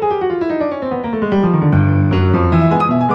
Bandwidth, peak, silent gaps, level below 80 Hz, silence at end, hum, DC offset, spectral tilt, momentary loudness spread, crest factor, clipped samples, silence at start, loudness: 6 kHz; -2 dBFS; none; -36 dBFS; 0 s; none; under 0.1%; -10 dB/octave; 6 LU; 12 dB; under 0.1%; 0 s; -15 LUFS